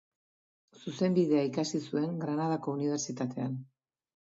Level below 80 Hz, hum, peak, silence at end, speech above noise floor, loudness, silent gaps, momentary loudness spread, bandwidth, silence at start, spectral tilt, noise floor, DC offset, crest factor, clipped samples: -78 dBFS; none; -16 dBFS; 0.6 s; over 59 dB; -32 LUFS; none; 10 LU; 7.8 kHz; 0.75 s; -6 dB/octave; under -90 dBFS; under 0.1%; 16 dB; under 0.1%